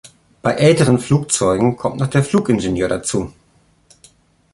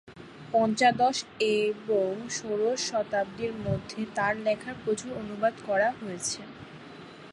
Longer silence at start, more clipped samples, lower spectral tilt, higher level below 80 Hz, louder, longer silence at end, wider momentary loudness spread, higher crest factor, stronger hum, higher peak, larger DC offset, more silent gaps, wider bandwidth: about the same, 0.05 s vs 0.05 s; neither; first, -5.5 dB/octave vs -4 dB/octave; first, -44 dBFS vs -60 dBFS; first, -16 LUFS vs -28 LUFS; first, 1.25 s vs 0 s; second, 9 LU vs 20 LU; about the same, 16 dB vs 18 dB; neither; first, -2 dBFS vs -12 dBFS; neither; neither; about the same, 11.5 kHz vs 11.5 kHz